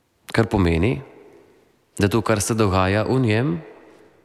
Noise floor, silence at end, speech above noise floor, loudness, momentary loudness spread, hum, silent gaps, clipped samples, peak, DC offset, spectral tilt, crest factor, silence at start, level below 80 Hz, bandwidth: -57 dBFS; 0.55 s; 38 dB; -21 LUFS; 7 LU; none; none; under 0.1%; -4 dBFS; under 0.1%; -6 dB/octave; 16 dB; 0.3 s; -40 dBFS; 15 kHz